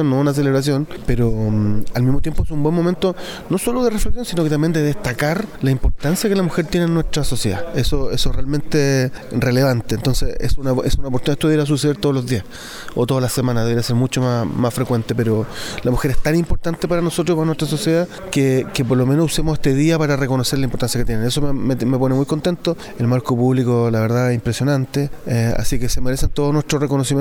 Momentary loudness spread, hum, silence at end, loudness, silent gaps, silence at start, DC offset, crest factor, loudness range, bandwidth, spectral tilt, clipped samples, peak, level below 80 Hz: 5 LU; none; 0 s; -19 LUFS; none; 0 s; under 0.1%; 14 dB; 2 LU; 18 kHz; -6 dB/octave; under 0.1%; -2 dBFS; -28 dBFS